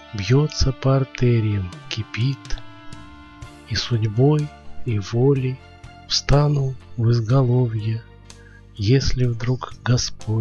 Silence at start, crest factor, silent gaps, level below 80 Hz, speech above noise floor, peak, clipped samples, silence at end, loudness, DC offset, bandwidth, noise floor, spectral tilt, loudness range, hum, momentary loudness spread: 0 s; 16 dB; none; -34 dBFS; 24 dB; -4 dBFS; under 0.1%; 0 s; -21 LUFS; under 0.1%; 7.6 kHz; -44 dBFS; -6 dB/octave; 4 LU; none; 17 LU